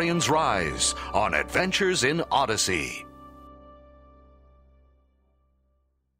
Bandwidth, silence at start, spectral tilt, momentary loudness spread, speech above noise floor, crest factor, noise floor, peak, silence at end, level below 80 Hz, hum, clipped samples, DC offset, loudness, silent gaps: 16 kHz; 0 s; -3 dB/octave; 6 LU; 46 dB; 20 dB; -71 dBFS; -6 dBFS; 2.45 s; -48 dBFS; none; under 0.1%; under 0.1%; -24 LUFS; none